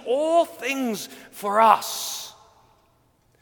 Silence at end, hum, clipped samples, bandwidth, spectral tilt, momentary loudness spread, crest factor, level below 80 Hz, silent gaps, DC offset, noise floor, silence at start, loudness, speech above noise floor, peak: 1.1 s; none; under 0.1%; 19 kHz; -2.5 dB/octave; 16 LU; 22 dB; -70 dBFS; none; under 0.1%; -63 dBFS; 0 s; -22 LUFS; 40 dB; -2 dBFS